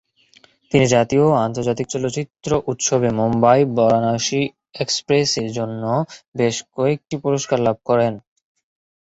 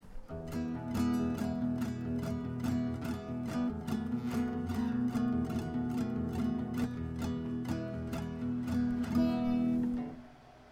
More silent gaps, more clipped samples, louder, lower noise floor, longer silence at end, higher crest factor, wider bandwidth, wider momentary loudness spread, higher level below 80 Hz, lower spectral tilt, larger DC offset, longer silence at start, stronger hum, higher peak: first, 6.28-6.32 s vs none; neither; first, -19 LUFS vs -35 LUFS; about the same, -54 dBFS vs -55 dBFS; first, 0.9 s vs 0 s; about the same, 18 dB vs 14 dB; second, 8.2 kHz vs 15.5 kHz; about the same, 9 LU vs 7 LU; about the same, -52 dBFS vs -52 dBFS; second, -5 dB/octave vs -7.5 dB/octave; neither; first, 0.7 s vs 0.05 s; neither; first, -2 dBFS vs -20 dBFS